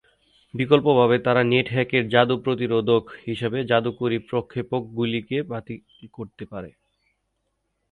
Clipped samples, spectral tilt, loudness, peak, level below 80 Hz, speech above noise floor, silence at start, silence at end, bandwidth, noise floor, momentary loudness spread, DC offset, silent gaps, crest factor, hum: under 0.1%; -8 dB/octave; -22 LUFS; -2 dBFS; -58 dBFS; 52 dB; 0.55 s; 1.25 s; 4.5 kHz; -75 dBFS; 19 LU; under 0.1%; none; 22 dB; none